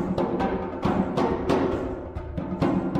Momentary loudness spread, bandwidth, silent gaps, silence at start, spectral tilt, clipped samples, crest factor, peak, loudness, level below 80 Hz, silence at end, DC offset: 9 LU; 10 kHz; none; 0 s; -8 dB/octave; under 0.1%; 16 dB; -10 dBFS; -26 LUFS; -40 dBFS; 0 s; under 0.1%